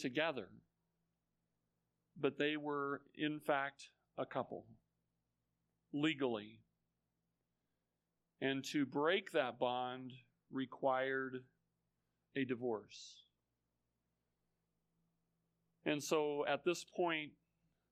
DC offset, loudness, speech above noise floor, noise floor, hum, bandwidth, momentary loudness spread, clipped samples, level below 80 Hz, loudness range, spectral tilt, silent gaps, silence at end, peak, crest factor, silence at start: under 0.1%; -40 LUFS; 49 dB; -89 dBFS; 60 Hz at -80 dBFS; 10 kHz; 15 LU; under 0.1%; -88 dBFS; 8 LU; -4.5 dB/octave; none; 0.6 s; -20 dBFS; 22 dB; 0 s